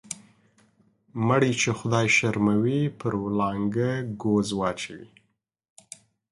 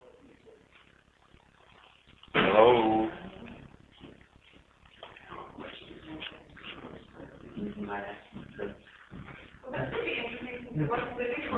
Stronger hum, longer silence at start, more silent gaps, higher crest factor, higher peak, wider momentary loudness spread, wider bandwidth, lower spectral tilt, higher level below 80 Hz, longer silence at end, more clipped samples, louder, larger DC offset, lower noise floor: neither; second, 0.1 s vs 0.45 s; neither; second, 20 dB vs 26 dB; about the same, -8 dBFS vs -8 dBFS; second, 21 LU vs 25 LU; first, 11.5 kHz vs 4.4 kHz; second, -5.5 dB/octave vs -7.5 dB/octave; about the same, -58 dBFS vs -58 dBFS; first, 1.25 s vs 0 s; neither; first, -24 LUFS vs -30 LUFS; neither; first, -73 dBFS vs -62 dBFS